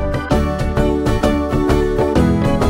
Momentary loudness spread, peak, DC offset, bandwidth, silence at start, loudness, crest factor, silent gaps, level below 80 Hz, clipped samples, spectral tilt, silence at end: 3 LU; -2 dBFS; under 0.1%; 16.5 kHz; 0 s; -16 LUFS; 14 dB; none; -22 dBFS; under 0.1%; -7 dB/octave; 0 s